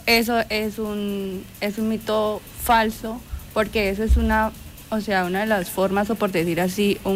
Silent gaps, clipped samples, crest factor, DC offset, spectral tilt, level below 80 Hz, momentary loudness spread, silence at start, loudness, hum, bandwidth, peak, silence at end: none; under 0.1%; 16 dB; under 0.1%; -5 dB/octave; -32 dBFS; 9 LU; 0 s; -23 LUFS; none; 16 kHz; -6 dBFS; 0 s